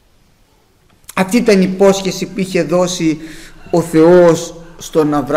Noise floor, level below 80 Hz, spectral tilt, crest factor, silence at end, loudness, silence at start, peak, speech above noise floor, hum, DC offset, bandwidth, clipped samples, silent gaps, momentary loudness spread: -52 dBFS; -42 dBFS; -5.5 dB/octave; 12 dB; 0 s; -13 LUFS; 1.15 s; -2 dBFS; 40 dB; none; under 0.1%; 16 kHz; under 0.1%; none; 14 LU